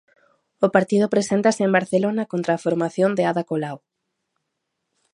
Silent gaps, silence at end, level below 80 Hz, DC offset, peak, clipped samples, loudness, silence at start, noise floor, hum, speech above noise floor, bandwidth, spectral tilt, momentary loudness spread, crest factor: none; 1.35 s; -70 dBFS; under 0.1%; 0 dBFS; under 0.1%; -21 LUFS; 0.6 s; -78 dBFS; none; 58 dB; 11.5 kHz; -6 dB/octave; 8 LU; 22 dB